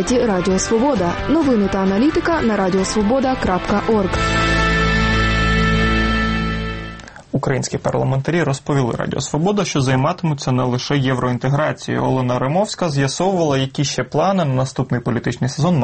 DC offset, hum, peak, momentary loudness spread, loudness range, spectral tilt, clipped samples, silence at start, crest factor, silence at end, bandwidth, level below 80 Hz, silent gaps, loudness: under 0.1%; none; -4 dBFS; 5 LU; 3 LU; -5.5 dB/octave; under 0.1%; 0 s; 14 dB; 0 s; 8.8 kHz; -30 dBFS; none; -18 LUFS